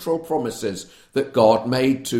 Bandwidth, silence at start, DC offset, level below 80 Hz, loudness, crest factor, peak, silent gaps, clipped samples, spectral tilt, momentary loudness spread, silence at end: 16.5 kHz; 0 s; under 0.1%; -58 dBFS; -21 LUFS; 18 dB; -2 dBFS; none; under 0.1%; -5.5 dB/octave; 12 LU; 0 s